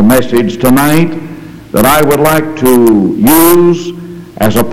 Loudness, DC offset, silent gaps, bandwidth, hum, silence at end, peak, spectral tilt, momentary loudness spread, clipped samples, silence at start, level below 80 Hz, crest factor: -8 LUFS; 5%; none; over 20 kHz; none; 0 s; 0 dBFS; -5.5 dB/octave; 17 LU; 0.9%; 0 s; -34 dBFS; 8 dB